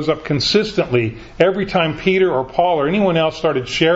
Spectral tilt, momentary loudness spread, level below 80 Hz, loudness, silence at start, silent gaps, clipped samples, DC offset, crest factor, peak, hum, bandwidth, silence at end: -5.5 dB/octave; 4 LU; -44 dBFS; -17 LUFS; 0 s; none; under 0.1%; under 0.1%; 16 dB; 0 dBFS; none; 8 kHz; 0 s